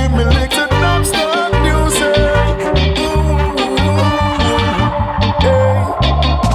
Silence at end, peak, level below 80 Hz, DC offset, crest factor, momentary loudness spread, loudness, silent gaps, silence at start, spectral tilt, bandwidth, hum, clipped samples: 0 s; 0 dBFS; -18 dBFS; under 0.1%; 12 dB; 3 LU; -13 LUFS; none; 0 s; -5 dB/octave; 15.5 kHz; none; under 0.1%